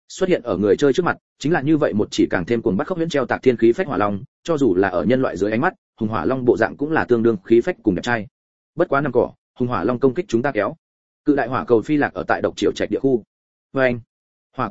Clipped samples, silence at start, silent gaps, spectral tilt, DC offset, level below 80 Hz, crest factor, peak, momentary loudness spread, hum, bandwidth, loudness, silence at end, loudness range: under 0.1%; 0.1 s; 1.21-1.36 s, 4.28-4.43 s, 5.78-5.93 s, 8.31-8.73 s, 9.38-9.54 s, 10.78-11.24 s, 13.27-13.70 s, 14.07-14.50 s; -6.5 dB/octave; 0.8%; -50 dBFS; 18 dB; 0 dBFS; 8 LU; none; 8 kHz; -20 LUFS; 0 s; 2 LU